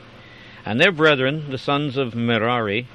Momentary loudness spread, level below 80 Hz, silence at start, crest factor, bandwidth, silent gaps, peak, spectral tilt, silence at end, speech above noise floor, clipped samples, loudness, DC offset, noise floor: 11 LU; -58 dBFS; 0.05 s; 20 dB; 11.5 kHz; none; -2 dBFS; -6 dB/octave; 0 s; 23 dB; under 0.1%; -19 LUFS; under 0.1%; -43 dBFS